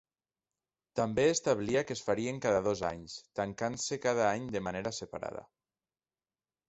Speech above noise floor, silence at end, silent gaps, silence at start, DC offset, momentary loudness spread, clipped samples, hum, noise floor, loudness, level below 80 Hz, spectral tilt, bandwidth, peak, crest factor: over 57 dB; 1.25 s; none; 0.95 s; under 0.1%; 12 LU; under 0.1%; none; under -90 dBFS; -33 LUFS; -62 dBFS; -4.5 dB/octave; 8.2 kHz; -14 dBFS; 20 dB